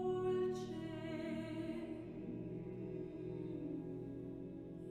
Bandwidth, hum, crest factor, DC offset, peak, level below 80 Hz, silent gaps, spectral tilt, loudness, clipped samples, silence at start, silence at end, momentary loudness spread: 10.5 kHz; none; 14 dB; under 0.1%; -30 dBFS; -66 dBFS; none; -8 dB/octave; -45 LUFS; under 0.1%; 0 s; 0 s; 10 LU